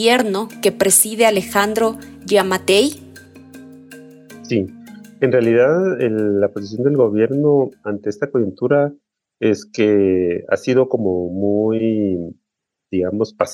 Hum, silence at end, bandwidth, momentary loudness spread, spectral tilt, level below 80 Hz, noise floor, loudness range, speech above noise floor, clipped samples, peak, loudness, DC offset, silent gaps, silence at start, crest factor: none; 0 s; 17 kHz; 8 LU; -4.5 dB/octave; -58 dBFS; -80 dBFS; 4 LU; 63 dB; under 0.1%; -2 dBFS; -17 LUFS; under 0.1%; none; 0 s; 16 dB